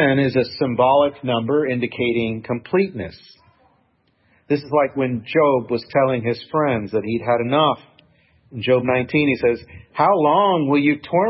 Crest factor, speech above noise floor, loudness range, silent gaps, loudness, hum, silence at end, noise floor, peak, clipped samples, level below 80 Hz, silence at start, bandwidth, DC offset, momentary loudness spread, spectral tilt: 16 dB; 44 dB; 5 LU; none; -19 LUFS; none; 0 s; -63 dBFS; -4 dBFS; under 0.1%; -56 dBFS; 0 s; 5.8 kHz; under 0.1%; 8 LU; -11 dB/octave